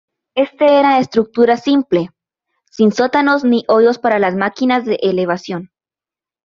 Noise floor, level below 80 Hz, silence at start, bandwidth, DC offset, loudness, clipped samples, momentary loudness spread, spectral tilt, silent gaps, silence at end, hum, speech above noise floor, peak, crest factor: under -90 dBFS; -60 dBFS; 0.35 s; 7.2 kHz; under 0.1%; -14 LUFS; under 0.1%; 8 LU; -6 dB/octave; none; 0.8 s; none; over 77 dB; -2 dBFS; 14 dB